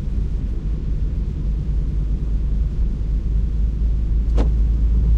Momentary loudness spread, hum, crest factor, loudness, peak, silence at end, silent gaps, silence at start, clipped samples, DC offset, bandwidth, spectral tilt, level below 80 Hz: 5 LU; none; 14 dB; -23 LUFS; -6 dBFS; 0 s; none; 0 s; under 0.1%; under 0.1%; 3.6 kHz; -9.5 dB/octave; -18 dBFS